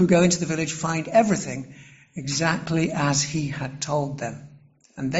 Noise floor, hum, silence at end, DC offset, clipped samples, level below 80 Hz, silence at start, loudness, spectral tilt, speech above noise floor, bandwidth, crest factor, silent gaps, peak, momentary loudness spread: -51 dBFS; none; 0 s; under 0.1%; under 0.1%; -54 dBFS; 0 s; -24 LUFS; -4.5 dB/octave; 28 dB; 8.2 kHz; 18 dB; none; -6 dBFS; 14 LU